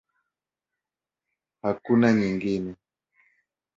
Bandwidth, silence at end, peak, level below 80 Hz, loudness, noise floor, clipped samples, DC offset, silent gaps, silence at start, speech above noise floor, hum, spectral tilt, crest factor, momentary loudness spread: 7.6 kHz; 1.05 s; -6 dBFS; -62 dBFS; -24 LUFS; -89 dBFS; under 0.1%; under 0.1%; none; 1.65 s; 66 dB; none; -7.5 dB/octave; 22 dB; 12 LU